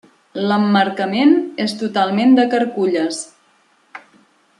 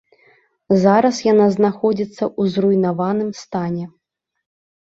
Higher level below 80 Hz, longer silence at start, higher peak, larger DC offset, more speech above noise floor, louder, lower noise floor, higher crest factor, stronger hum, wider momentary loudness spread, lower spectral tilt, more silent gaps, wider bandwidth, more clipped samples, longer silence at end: second, -68 dBFS vs -60 dBFS; second, 0.35 s vs 0.7 s; about the same, -2 dBFS vs -2 dBFS; neither; about the same, 41 dB vs 39 dB; about the same, -16 LUFS vs -17 LUFS; about the same, -57 dBFS vs -56 dBFS; about the same, 16 dB vs 16 dB; neither; about the same, 10 LU vs 11 LU; second, -5.5 dB/octave vs -7 dB/octave; neither; first, 11 kHz vs 7.8 kHz; neither; second, 0.6 s vs 0.95 s